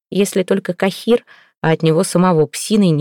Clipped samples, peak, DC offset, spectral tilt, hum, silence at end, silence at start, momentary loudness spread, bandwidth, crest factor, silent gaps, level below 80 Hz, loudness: under 0.1%; -4 dBFS; under 0.1%; -6 dB/octave; none; 0 s; 0.1 s; 5 LU; 17.5 kHz; 10 dB; none; -54 dBFS; -16 LUFS